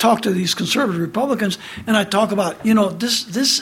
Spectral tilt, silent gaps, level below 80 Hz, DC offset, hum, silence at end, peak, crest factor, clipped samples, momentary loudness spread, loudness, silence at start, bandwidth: -4 dB/octave; none; -56 dBFS; under 0.1%; none; 0 s; -2 dBFS; 16 dB; under 0.1%; 4 LU; -18 LUFS; 0 s; 16.5 kHz